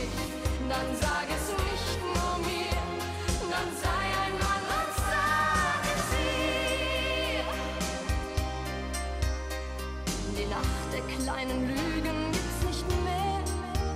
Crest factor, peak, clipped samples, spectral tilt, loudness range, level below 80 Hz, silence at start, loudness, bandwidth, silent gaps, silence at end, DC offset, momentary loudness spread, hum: 16 dB; -14 dBFS; under 0.1%; -4 dB/octave; 5 LU; -36 dBFS; 0 s; -30 LUFS; 16 kHz; none; 0 s; under 0.1%; 6 LU; none